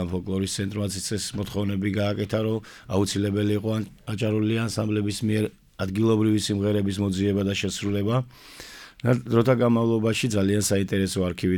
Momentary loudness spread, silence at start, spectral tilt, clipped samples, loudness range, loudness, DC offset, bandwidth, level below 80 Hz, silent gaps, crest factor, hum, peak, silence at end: 8 LU; 0 s; -5.5 dB/octave; under 0.1%; 3 LU; -25 LUFS; under 0.1%; 18.5 kHz; -54 dBFS; none; 16 dB; none; -8 dBFS; 0 s